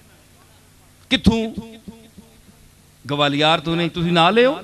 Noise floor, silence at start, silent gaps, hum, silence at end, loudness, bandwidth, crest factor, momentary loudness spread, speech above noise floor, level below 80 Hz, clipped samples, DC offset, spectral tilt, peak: -50 dBFS; 1.1 s; none; none; 0 s; -18 LUFS; 13 kHz; 20 dB; 18 LU; 32 dB; -42 dBFS; under 0.1%; under 0.1%; -5.5 dB/octave; 0 dBFS